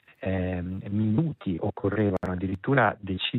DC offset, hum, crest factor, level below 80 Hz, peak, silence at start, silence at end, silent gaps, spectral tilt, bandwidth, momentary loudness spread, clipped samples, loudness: under 0.1%; none; 18 dB; -58 dBFS; -8 dBFS; 0.2 s; 0 s; none; -9 dB/octave; 4.3 kHz; 8 LU; under 0.1%; -27 LUFS